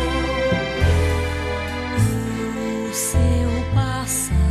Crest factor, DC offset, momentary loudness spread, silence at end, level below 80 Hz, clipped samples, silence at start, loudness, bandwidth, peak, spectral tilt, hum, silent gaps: 14 dB; under 0.1%; 6 LU; 0 s; -26 dBFS; under 0.1%; 0 s; -21 LUFS; 13 kHz; -6 dBFS; -5 dB/octave; none; none